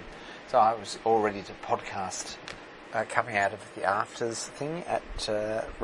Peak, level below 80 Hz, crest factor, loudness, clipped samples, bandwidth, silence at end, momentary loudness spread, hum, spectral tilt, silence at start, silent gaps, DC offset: -6 dBFS; -52 dBFS; 24 dB; -30 LUFS; under 0.1%; 11.5 kHz; 0 s; 13 LU; none; -3.5 dB/octave; 0 s; none; under 0.1%